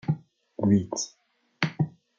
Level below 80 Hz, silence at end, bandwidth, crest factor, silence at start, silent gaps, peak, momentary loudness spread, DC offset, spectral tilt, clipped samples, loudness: -66 dBFS; 0.3 s; 7.6 kHz; 22 dB; 0.05 s; none; -6 dBFS; 11 LU; under 0.1%; -5.5 dB/octave; under 0.1%; -28 LUFS